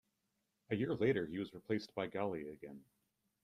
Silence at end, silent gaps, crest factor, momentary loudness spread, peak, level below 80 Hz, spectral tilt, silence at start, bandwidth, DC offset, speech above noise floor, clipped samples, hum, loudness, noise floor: 0.6 s; none; 20 dB; 17 LU; -22 dBFS; -74 dBFS; -7.5 dB/octave; 0.7 s; 13 kHz; under 0.1%; 46 dB; under 0.1%; none; -40 LUFS; -85 dBFS